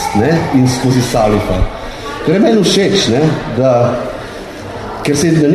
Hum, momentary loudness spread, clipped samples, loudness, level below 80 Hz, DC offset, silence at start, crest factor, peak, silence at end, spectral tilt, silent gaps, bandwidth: none; 14 LU; under 0.1%; -12 LUFS; -28 dBFS; under 0.1%; 0 s; 12 dB; 0 dBFS; 0 s; -5.5 dB/octave; none; 14 kHz